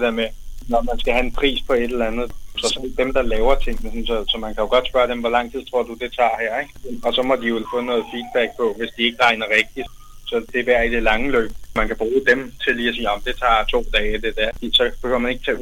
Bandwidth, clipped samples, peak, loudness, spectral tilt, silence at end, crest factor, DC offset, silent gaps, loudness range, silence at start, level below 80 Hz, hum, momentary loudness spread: 15.5 kHz; under 0.1%; -4 dBFS; -20 LUFS; -3.5 dB/octave; 0 s; 16 dB; under 0.1%; none; 2 LU; 0 s; -30 dBFS; none; 8 LU